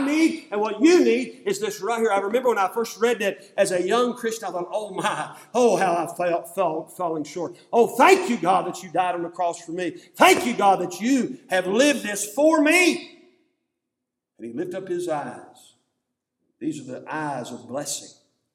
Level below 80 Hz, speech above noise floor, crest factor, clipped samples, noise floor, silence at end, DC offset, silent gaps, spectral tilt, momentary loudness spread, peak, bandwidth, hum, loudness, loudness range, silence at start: -76 dBFS; 61 dB; 22 dB; under 0.1%; -83 dBFS; 0.45 s; under 0.1%; none; -3.5 dB/octave; 15 LU; -2 dBFS; 17.5 kHz; none; -22 LUFS; 13 LU; 0 s